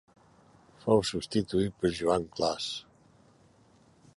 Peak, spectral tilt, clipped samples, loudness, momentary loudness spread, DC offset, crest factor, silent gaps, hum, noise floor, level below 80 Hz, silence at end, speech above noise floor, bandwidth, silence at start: -10 dBFS; -5 dB/octave; under 0.1%; -30 LUFS; 9 LU; under 0.1%; 22 dB; none; none; -62 dBFS; -56 dBFS; 1.35 s; 33 dB; 11.5 kHz; 0.85 s